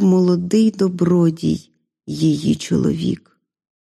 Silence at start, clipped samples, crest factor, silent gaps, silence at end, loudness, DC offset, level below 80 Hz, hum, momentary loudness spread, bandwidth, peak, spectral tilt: 0 s; under 0.1%; 12 dB; none; 0.65 s; -18 LUFS; under 0.1%; -50 dBFS; none; 9 LU; 12 kHz; -4 dBFS; -7.5 dB/octave